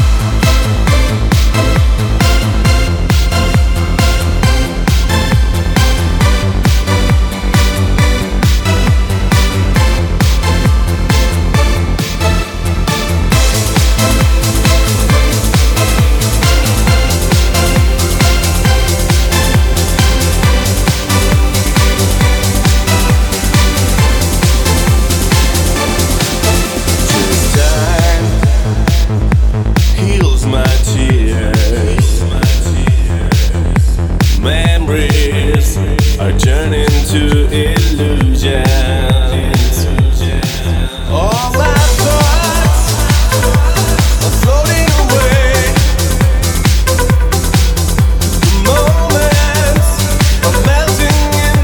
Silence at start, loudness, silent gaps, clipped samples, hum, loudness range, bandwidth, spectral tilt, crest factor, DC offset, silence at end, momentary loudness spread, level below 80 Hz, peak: 0 s; -11 LUFS; none; under 0.1%; none; 2 LU; 19.5 kHz; -4.5 dB/octave; 10 dB; under 0.1%; 0 s; 2 LU; -12 dBFS; 0 dBFS